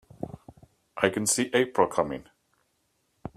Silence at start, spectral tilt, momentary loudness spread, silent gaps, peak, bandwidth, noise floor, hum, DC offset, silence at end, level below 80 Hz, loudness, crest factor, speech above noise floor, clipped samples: 0.2 s; -3.5 dB/octave; 21 LU; none; -4 dBFS; 15.5 kHz; -73 dBFS; none; under 0.1%; 0.05 s; -62 dBFS; -26 LUFS; 26 dB; 48 dB; under 0.1%